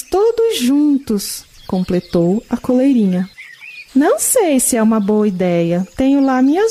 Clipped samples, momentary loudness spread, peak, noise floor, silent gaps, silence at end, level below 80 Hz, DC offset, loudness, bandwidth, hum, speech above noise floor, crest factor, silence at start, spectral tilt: under 0.1%; 10 LU; -2 dBFS; -36 dBFS; none; 0 s; -44 dBFS; under 0.1%; -15 LUFS; 15.5 kHz; none; 22 dB; 12 dB; 0.1 s; -5 dB/octave